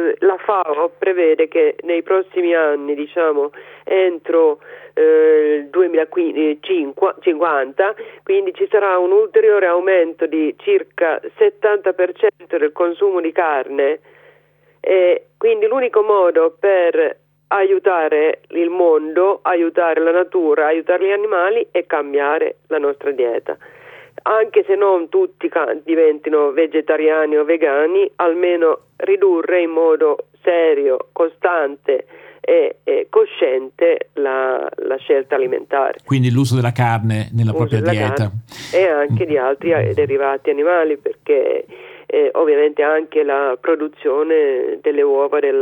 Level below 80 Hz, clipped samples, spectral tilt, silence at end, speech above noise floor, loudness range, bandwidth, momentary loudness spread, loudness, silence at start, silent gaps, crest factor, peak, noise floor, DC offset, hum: -64 dBFS; under 0.1%; -7.5 dB/octave; 0 s; 39 dB; 2 LU; 10.5 kHz; 6 LU; -16 LUFS; 0 s; none; 14 dB; -2 dBFS; -55 dBFS; under 0.1%; 50 Hz at -60 dBFS